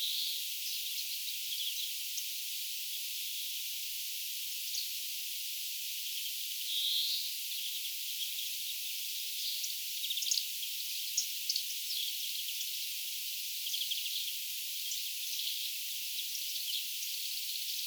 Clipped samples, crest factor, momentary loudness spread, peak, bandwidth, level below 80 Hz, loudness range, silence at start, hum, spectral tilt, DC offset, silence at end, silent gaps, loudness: under 0.1%; 20 dB; 4 LU; -18 dBFS; over 20 kHz; under -90 dBFS; 2 LU; 0 s; none; 12 dB/octave; under 0.1%; 0 s; none; -34 LUFS